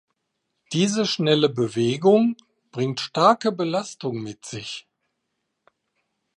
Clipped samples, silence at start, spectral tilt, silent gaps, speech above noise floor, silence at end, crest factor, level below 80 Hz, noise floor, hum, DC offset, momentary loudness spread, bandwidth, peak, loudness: under 0.1%; 0.7 s; -5 dB/octave; none; 56 dB; 1.55 s; 20 dB; -68 dBFS; -78 dBFS; none; under 0.1%; 16 LU; 11 kHz; -4 dBFS; -22 LUFS